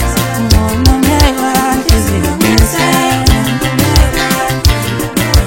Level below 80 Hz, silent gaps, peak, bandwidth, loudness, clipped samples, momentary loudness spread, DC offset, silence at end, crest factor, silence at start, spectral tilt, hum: -16 dBFS; none; 0 dBFS; over 20 kHz; -11 LUFS; 0.8%; 4 LU; under 0.1%; 0 s; 10 dB; 0 s; -4.5 dB/octave; none